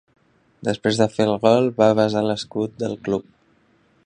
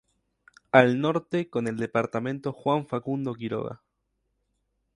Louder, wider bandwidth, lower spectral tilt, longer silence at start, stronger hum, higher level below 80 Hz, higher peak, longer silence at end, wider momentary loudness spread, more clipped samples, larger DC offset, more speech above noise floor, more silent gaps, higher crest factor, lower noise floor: first, -20 LUFS vs -26 LUFS; about the same, 10 kHz vs 11 kHz; about the same, -6 dB/octave vs -7 dB/octave; second, 0.6 s vs 0.75 s; neither; first, -58 dBFS vs -66 dBFS; about the same, -2 dBFS vs 0 dBFS; second, 0.85 s vs 1.2 s; about the same, 10 LU vs 12 LU; neither; neither; second, 40 dB vs 51 dB; neither; second, 20 dB vs 26 dB; second, -60 dBFS vs -77 dBFS